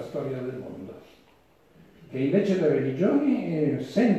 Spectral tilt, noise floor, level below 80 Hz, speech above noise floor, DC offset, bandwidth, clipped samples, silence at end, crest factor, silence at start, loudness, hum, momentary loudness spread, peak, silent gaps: -8.5 dB/octave; -60 dBFS; -68 dBFS; 35 dB; under 0.1%; 11.5 kHz; under 0.1%; 0 s; 16 dB; 0 s; -25 LUFS; none; 15 LU; -10 dBFS; none